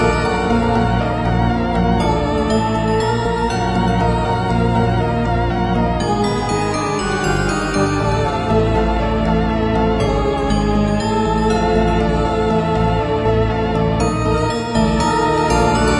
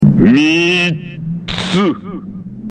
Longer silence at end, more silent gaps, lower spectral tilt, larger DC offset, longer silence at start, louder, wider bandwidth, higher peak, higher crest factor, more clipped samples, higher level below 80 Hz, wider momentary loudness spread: about the same, 0 s vs 0 s; neither; about the same, -6.5 dB/octave vs -6 dB/octave; neither; about the same, 0 s vs 0 s; second, -17 LUFS vs -13 LUFS; first, 11.5 kHz vs 9.6 kHz; about the same, -2 dBFS vs 0 dBFS; about the same, 14 dB vs 14 dB; neither; first, -26 dBFS vs -38 dBFS; second, 2 LU vs 18 LU